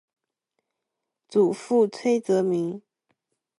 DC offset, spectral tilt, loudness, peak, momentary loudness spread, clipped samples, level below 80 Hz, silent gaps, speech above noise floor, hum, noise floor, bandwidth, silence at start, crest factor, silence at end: under 0.1%; -6.5 dB/octave; -24 LUFS; -10 dBFS; 7 LU; under 0.1%; -78 dBFS; none; 61 dB; none; -84 dBFS; 11.5 kHz; 1.3 s; 16 dB; 0.8 s